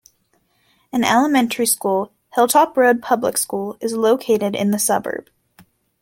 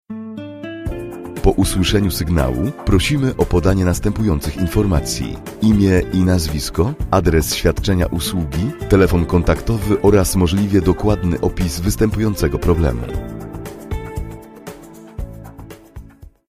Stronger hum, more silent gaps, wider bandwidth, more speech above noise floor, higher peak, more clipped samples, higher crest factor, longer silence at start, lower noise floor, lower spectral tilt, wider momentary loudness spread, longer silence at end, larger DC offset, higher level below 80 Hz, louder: neither; neither; about the same, 17 kHz vs 15.5 kHz; first, 46 dB vs 23 dB; about the same, -2 dBFS vs 0 dBFS; neither; about the same, 18 dB vs 16 dB; first, 0.95 s vs 0.1 s; first, -64 dBFS vs -39 dBFS; second, -3.5 dB/octave vs -6 dB/octave; second, 10 LU vs 17 LU; first, 0.8 s vs 0.25 s; neither; second, -62 dBFS vs -26 dBFS; about the same, -18 LUFS vs -17 LUFS